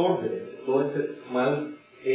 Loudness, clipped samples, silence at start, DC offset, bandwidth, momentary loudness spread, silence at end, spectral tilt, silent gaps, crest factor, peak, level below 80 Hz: -28 LUFS; under 0.1%; 0 s; under 0.1%; 4 kHz; 8 LU; 0 s; -10.5 dB/octave; none; 16 dB; -10 dBFS; -78 dBFS